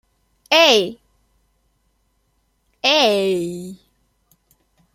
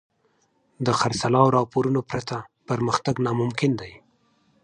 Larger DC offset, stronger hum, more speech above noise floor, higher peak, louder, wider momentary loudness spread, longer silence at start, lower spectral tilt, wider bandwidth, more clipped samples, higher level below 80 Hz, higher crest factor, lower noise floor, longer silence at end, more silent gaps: neither; neither; first, 50 dB vs 44 dB; first, 0 dBFS vs -4 dBFS; first, -16 LUFS vs -23 LUFS; first, 17 LU vs 12 LU; second, 0.5 s vs 0.8 s; second, -2.5 dB/octave vs -6 dB/octave; first, 16.5 kHz vs 10 kHz; neither; second, -64 dBFS vs -56 dBFS; about the same, 22 dB vs 20 dB; about the same, -66 dBFS vs -67 dBFS; first, 1.2 s vs 0.65 s; neither